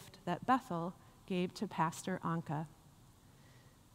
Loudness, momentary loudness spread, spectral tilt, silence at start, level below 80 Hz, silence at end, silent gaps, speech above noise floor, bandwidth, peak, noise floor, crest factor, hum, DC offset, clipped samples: -38 LUFS; 10 LU; -6 dB/octave; 0 s; -70 dBFS; 0.35 s; none; 25 dB; 16 kHz; -20 dBFS; -62 dBFS; 20 dB; none; under 0.1%; under 0.1%